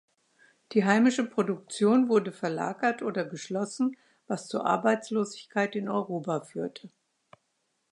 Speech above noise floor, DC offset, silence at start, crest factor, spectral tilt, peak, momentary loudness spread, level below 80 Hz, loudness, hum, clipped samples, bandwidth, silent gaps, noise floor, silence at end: 49 dB; under 0.1%; 0.7 s; 20 dB; -5.5 dB/octave; -8 dBFS; 11 LU; -82 dBFS; -28 LUFS; none; under 0.1%; 11 kHz; none; -77 dBFS; 1.05 s